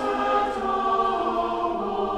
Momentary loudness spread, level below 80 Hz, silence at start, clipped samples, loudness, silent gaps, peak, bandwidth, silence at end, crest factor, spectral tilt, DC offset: 4 LU; -50 dBFS; 0 s; under 0.1%; -24 LUFS; none; -12 dBFS; 12 kHz; 0 s; 14 dB; -5.5 dB/octave; under 0.1%